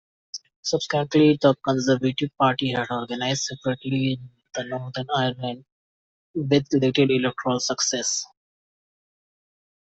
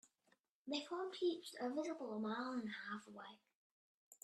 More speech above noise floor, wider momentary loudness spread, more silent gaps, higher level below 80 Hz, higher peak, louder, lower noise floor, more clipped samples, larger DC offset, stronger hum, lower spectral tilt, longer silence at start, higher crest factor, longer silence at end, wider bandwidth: first, over 67 dB vs 36 dB; about the same, 14 LU vs 15 LU; first, 0.56-0.63 s, 5.72-6.34 s vs 3.55-4.11 s; first, -62 dBFS vs under -90 dBFS; first, -4 dBFS vs -30 dBFS; first, -23 LUFS vs -45 LUFS; first, under -90 dBFS vs -81 dBFS; neither; neither; neither; about the same, -4.5 dB/octave vs -4.5 dB/octave; second, 0.35 s vs 0.65 s; about the same, 20 dB vs 16 dB; first, 1.7 s vs 0.1 s; second, 8.2 kHz vs 13 kHz